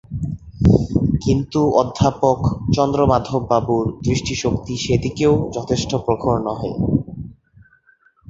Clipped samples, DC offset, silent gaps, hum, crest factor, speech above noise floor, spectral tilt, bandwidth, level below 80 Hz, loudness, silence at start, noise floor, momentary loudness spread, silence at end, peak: under 0.1%; under 0.1%; none; none; 18 dB; 38 dB; -7 dB/octave; 8 kHz; -34 dBFS; -19 LUFS; 0.1 s; -56 dBFS; 7 LU; 0.95 s; -2 dBFS